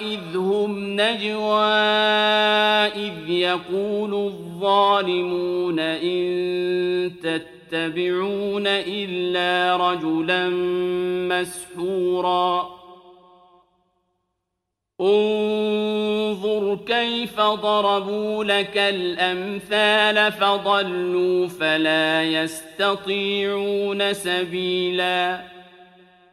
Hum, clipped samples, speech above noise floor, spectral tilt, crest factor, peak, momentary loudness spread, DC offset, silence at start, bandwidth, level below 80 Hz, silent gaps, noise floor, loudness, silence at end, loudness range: none; under 0.1%; 59 dB; -4.5 dB/octave; 18 dB; -4 dBFS; 8 LU; under 0.1%; 0 s; 13.5 kHz; -64 dBFS; none; -81 dBFS; -21 LUFS; 0.5 s; 5 LU